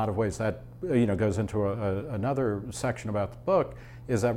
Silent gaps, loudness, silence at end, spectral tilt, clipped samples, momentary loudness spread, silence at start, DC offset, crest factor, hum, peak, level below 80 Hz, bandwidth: none; -29 LUFS; 0 s; -7 dB/octave; under 0.1%; 6 LU; 0 s; under 0.1%; 14 dB; none; -14 dBFS; -50 dBFS; 13.5 kHz